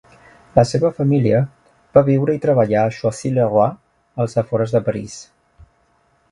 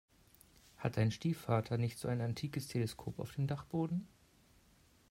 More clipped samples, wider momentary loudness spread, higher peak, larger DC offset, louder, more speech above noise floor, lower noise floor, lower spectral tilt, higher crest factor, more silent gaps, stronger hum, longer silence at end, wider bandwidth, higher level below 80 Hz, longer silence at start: neither; first, 10 LU vs 7 LU; first, 0 dBFS vs -18 dBFS; neither; first, -18 LUFS vs -38 LUFS; first, 43 dB vs 31 dB; second, -60 dBFS vs -68 dBFS; about the same, -7.5 dB/octave vs -7 dB/octave; about the same, 18 dB vs 20 dB; neither; neither; about the same, 1.1 s vs 1.05 s; second, 11 kHz vs 16 kHz; first, -50 dBFS vs -66 dBFS; second, 0.55 s vs 0.8 s